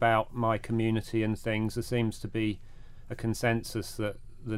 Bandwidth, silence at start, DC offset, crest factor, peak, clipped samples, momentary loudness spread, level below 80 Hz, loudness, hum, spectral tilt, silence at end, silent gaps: 16 kHz; 0 s; under 0.1%; 18 dB; -12 dBFS; under 0.1%; 8 LU; -48 dBFS; -31 LUFS; none; -6 dB/octave; 0 s; none